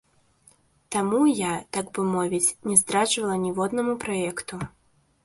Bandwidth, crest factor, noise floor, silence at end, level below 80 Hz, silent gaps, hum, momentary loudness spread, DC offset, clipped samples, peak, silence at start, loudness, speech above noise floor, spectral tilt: 12 kHz; 24 dB; -60 dBFS; 0.55 s; -60 dBFS; none; none; 11 LU; under 0.1%; under 0.1%; -2 dBFS; 0.9 s; -24 LUFS; 35 dB; -3.5 dB/octave